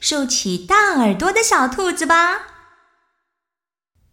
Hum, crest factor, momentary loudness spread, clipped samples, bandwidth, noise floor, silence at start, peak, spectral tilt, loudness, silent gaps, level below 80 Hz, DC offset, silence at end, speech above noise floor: none; 16 dB; 5 LU; under 0.1%; 17 kHz; -88 dBFS; 0 s; -2 dBFS; -2.5 dB/octave; -16 LUFS; none; -48 dBFS; under 0.1%; 1.65 s; 72 dB